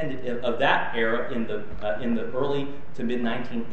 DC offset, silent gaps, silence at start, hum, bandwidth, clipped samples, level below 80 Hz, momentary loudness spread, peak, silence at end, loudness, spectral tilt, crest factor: 5%; none; 0 s; none; 8.2 kHz; under 0.1%; -50 dBFS; 9 LU; -6 dBFS; 0 s; -27 LUFS; -6.5 dB/octave; 22 dB